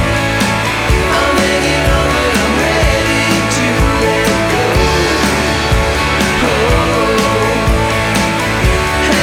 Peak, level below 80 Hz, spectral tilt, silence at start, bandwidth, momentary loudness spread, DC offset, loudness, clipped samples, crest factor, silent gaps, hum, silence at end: 0 dBFS; -20 dBFS; -4.5 dB/octave; 0 s; 18 kHz; 1 LU; under 0.1%; -12 LUFS; under 0.1%; 12 dB; none; none; 0 s